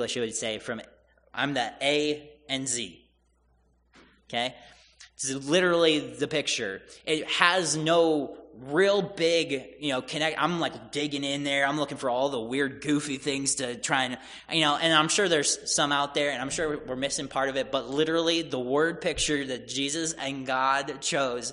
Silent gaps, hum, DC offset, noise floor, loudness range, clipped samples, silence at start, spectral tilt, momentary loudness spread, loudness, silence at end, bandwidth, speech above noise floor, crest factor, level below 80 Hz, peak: none; none; under 0.1%; -67 dBFS; 6 LU; under 0.1%; 0 s; -2.5 dB/octave; 9 LU; -27 LUFS; 0 s; 10.5 kHz; 39 dB; 24 dB; -60 dBFS; -4 dBFS